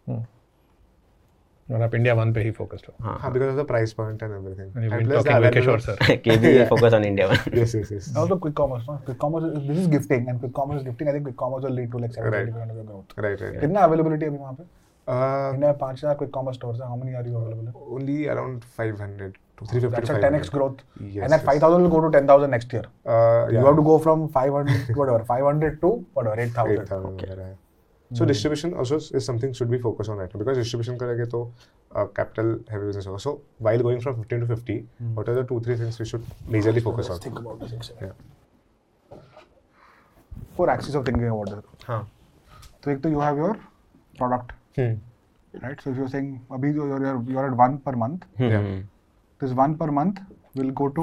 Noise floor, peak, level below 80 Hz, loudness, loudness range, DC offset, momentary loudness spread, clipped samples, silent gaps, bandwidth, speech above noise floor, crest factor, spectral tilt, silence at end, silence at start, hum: -62 dBFS; -2 dBFS; -50 dBFS; -23 LUFS; 10 LU; under 0.1%; 17 LU; under 0.1%; none; 12.5 kHz; 40 dB; 22 dB; -7.5 dB/octave; 0 s; 0.05 s; none